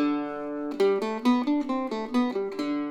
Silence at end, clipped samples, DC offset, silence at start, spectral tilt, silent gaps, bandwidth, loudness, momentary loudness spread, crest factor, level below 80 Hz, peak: 0 s; under 0.1%; under 0.1%; 0 s; -5.5 dB/octave; none; 12 kHz; -27 LUFS; 7 LU; 14 dB; -64 dBFS; -12 dBFS